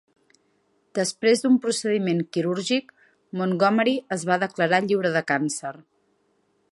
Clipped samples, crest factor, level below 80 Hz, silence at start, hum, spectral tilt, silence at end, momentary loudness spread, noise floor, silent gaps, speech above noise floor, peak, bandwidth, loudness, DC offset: under 0.1%; 20 dB; -74 dBFS; 0.95 s; none; -4.5 dB/octave; 0.95 s; 8 LU; -68 dBFS; none; 45 dB; -6 dBFS; 11.5 kHz; -23 LUFS; under 0.1%